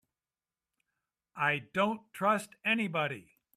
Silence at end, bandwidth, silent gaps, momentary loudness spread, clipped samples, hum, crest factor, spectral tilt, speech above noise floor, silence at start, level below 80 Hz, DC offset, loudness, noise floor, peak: 0.35 s; 14.5 kHz; none; 6 LU; under 0.1%; none; 20 dB; -5 dB/octave; over 58 dB; 1.35 s; -78 dBFS; under 0.1%; -32 LUFS; under -90 dBFS; -14 dBFS